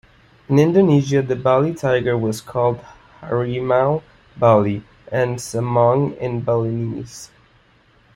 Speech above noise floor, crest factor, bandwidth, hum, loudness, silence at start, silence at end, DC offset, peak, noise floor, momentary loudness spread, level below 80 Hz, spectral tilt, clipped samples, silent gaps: 37 dB; 18 dB; 15.5 kHz; none; -18 LUFS; 0.5 s; 0.9 s; under 0.1%; -2 dBFS; -55 dBFS; 11 LU; -52 dBFS; -7 dB/octave; under 0.1%; none